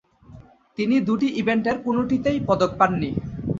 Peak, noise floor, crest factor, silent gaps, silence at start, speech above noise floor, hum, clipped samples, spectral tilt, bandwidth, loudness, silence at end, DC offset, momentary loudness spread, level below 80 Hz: -2 dBFS; -47 dBFS; 20 dB; none; 0.3 s; 25 dB; none; under 0.1%; -7 dB/octave; 7.6 kHz; -22 LUFS; 0 s; under 0.1%; 8 LU; -48 dBFS